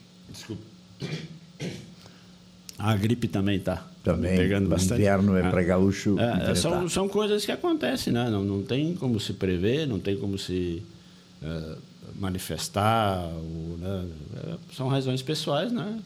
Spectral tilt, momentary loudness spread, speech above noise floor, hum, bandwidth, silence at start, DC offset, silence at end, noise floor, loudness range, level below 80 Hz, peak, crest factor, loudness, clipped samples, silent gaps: -6 dB/octave; 16 LU; 25 dB; none; 15.5 kHz; 0.2 s; under 0.1%; 0 s; -51 dBFS; 7 LU; -50 dBFS; -8 dBFS; 18 dB; -27 LUFS; under 0.1%; none